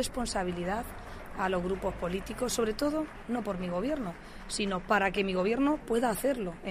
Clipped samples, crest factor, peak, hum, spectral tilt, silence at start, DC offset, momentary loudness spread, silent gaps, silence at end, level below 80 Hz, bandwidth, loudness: under 0.1%; 18 dB; -12 dBFS; none; -4.5 dB/octave; 0 s; under 0.1%; 8 LU; none; 0 s; -48 dBFS; 15.5 kHz; -31 LUFS